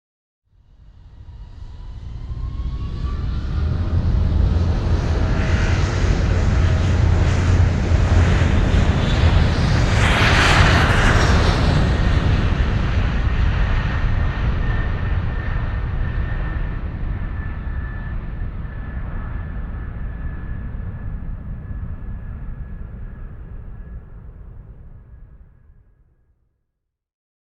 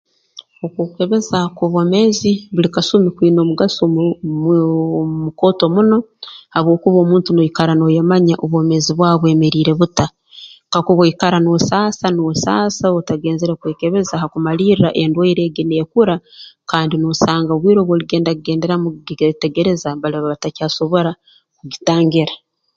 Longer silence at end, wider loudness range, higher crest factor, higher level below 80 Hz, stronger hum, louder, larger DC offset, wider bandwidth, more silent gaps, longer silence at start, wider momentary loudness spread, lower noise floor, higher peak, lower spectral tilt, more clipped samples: first, 2.05 s vs 0.4 s; first, 18 LU vs 4 LU; about the same, 18 dB vs 14 dB; first, -24 dBFS vs -50 dBFS; neither; second, -20 LUFS vs -15 LUFS; neither; first, 10 kHz vs 7.8 kHz; neither; first, 0.9 s vs 0.35 s; first, 20 LU vs 8 LU; first, -77 dBFS vs -42 dBFS; about the same, 0 dBFS vs 0 dBFS; about the same, -6 dB/octave vs -6 dB/octave; neither